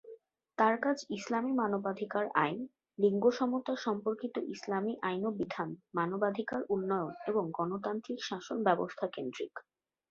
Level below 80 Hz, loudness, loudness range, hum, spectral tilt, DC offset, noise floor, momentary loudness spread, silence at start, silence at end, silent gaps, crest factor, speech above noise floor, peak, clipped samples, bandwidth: -78 dBFS; -34 LUFS; 3 LU; none; -4.5 dB/octave; under 0.1%; -55 dBFS; 9 LU; 0.05 s; 0.5 s; none; 22 dB; 22 dB; -12 dBFS; under 0.1%; 7.6 kHz